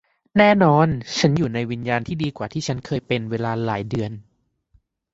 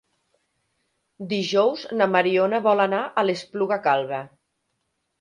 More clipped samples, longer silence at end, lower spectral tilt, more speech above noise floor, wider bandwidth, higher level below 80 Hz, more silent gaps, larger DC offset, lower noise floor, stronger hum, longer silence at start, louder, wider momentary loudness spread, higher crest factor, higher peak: neither; about the same, 0.9 s vs 0.95 s; about the same, -6 dB/octave vs -5.5 dB/octave; second, 41 dB vs 54 dB; second, 8 kHz vs 10.5 kHz; first, -50 dBFS vs -74 dBFS; neither; neither; second, -62 dBFS vs -75 dBFS; neither; second, 0.35 s vs 1.2 s; about the same, -21 LUFS vs -22 LUFS; about the same, 11 LU vs 9 LU; about the same, 20 dB vs 18 dB; first, -2 dBFS vs -6 dBFS